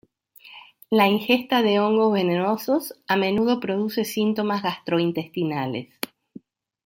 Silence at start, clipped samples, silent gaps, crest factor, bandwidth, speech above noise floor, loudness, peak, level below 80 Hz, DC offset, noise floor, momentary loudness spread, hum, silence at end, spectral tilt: 0.45 s; under 0.1%; none; 20 dB; 16.5 kHz; 29 dB; -22 LUFS; -4 dBFS; -66 dBFS; under 0.1%; -51 dBFS; 8 LU; none; 1 s; -5.5 dB/octave